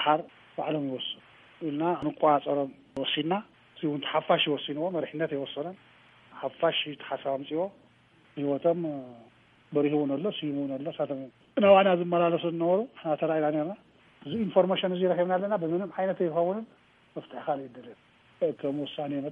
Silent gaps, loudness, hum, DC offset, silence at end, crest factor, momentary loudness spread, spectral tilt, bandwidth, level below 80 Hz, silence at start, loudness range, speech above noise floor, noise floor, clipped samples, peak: none; -29 LUFS; none; under 0.1%; 0 s; 22 dB; 13 LU; -8.5 dB/octave; 3.9 kHz; -74 dBFS; 0 s; 6 LU; 33 dB; -61 dBFS; under 0.1%; -6 dBFS